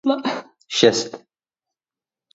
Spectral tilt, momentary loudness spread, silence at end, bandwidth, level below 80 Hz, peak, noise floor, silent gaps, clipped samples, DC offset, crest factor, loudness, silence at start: -3.5 dB/octave; 15 LU; 1.15 s; 8 kHz; -62 dBFS; 0 dBFS; under -90 dBFS; none; under 0.1%; under 0.1%; 22 dB; -19 LUFS; 0.05 s